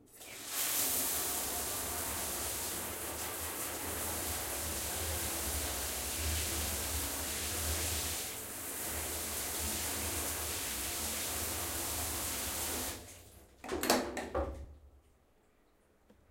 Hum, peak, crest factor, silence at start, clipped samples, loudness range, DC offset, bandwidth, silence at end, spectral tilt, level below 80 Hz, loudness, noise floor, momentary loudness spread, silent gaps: none; -12 dBFS; 26 dB; 0 s; under 0.1%; 2 LU; under 0.1%; 16.5 kHz; 1.3 s; -2 dB/octave; -50 dBFS; -35 LUFS; -69 dBFS; 7 LU; none